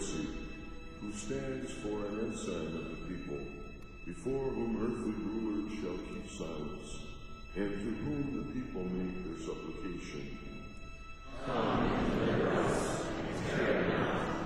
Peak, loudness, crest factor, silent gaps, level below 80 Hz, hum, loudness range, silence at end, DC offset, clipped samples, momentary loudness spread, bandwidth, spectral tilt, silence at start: -20 dBFS; -37 LUFS; 16 dB; none; -48 dBFS; none; 7 LU; 0 s; under 0.1%; under 0.1%; 15 LU; 12 kHz; -5.5 dB/octave; 0 s